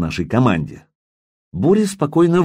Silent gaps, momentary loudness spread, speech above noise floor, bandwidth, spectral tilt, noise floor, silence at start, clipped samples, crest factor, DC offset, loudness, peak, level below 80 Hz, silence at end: 0.95-1.52 s; 11 LU; over 74 dB; 15.5 kHz; -7 dB/octave; under -90 dBFS; 0 s; under 0.1%; 14 dB; under 0.1%; -17 LUFS; -4 dBFS; -44 dBFS; 0 s